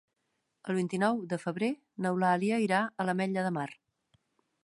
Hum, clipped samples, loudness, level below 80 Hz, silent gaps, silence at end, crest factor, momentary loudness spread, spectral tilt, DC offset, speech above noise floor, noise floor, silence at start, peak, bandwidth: none; under 0.1%; -31 LUFS; -80 dBFS; none; 0.9 s; 18 dB; 7 LU; -6.5 dB/octave; under 0.1%; 50 dB; -81 dBFS; 0.65 s; -14 dBFS; 11.5 kHz